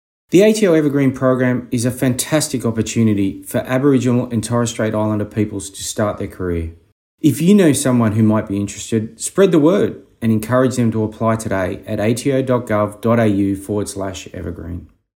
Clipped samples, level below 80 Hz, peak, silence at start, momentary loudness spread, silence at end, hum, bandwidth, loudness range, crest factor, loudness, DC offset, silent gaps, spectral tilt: under 0.1%; -48 dBFS; 0 dBFS; 0.3 s; 11 LU; 0.3 s; none; 16.5 kHz; 4 LU; 16 dB; -17 LUFS; under 0.1%; 6.92-7.18 s; -6 dB/octave